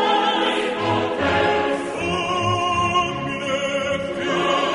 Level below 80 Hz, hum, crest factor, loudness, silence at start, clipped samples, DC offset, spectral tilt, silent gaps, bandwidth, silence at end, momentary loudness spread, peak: -48 dBFS; none; 14 dB; -21 LUFS; 0 s; under 0.1%; under 0.1%; -4.5 dB/octave; none; 11 kHz; 0 s; 5 LU; -8 dBFS